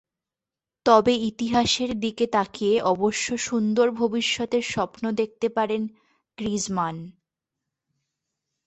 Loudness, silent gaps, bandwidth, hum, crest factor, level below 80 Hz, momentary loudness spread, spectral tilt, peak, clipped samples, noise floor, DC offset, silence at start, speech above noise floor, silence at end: -24 LUFS; none; 8.4 kHz; none; 22 dB; -56 dBFS; 8 LU; -4 dB/octave; -4 dBFS; under 0.1%; -90 dBFS; under 0.1%; 0.85 s; 66 dB; 1.55 s